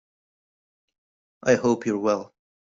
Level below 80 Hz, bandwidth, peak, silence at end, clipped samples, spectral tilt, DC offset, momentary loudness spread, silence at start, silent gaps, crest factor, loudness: -64 dBFS; 7.8 kHz; -6 dBFS; 0.5 s; under 0.1%; -5.5 dB/octave; under 0.1%; 8 LU; 1.45 s; none; 22 dB; -24 LUFS